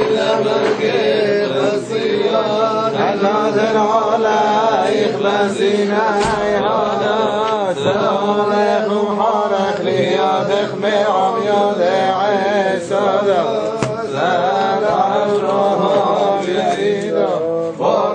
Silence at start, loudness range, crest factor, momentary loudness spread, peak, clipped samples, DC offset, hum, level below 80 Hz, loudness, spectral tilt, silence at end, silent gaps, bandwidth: 0 s; 1 LU; 14 dB; 3 LU; 0 dBFS; under 0.1%; under 0.1%; none; -52 dBFS; -16 LUFS; -5 dB/octave; 0 s; none; 9.6 kHz